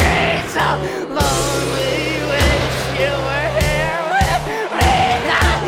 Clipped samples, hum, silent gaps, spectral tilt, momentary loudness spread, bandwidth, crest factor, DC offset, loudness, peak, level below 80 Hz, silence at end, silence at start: under 0.1%; none; none; -4 dB/octave; 4 LU; 16.5 kHz; 14 dB; under 0.1%; -17 LUFS; -4 dBFS; -26 dBFS; 0 s; 0 s